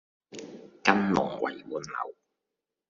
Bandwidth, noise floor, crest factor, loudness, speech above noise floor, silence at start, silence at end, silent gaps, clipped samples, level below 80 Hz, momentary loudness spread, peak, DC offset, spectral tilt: 7.4 kHz; -87 dBFS; 28 dB; -29 LUFS; 56 dB; 0.3 s; 0.8 s; none; under 0.1%; -66 dBFS; 20 LU; -2 dBFS; under 0.1%; -4 dB/octave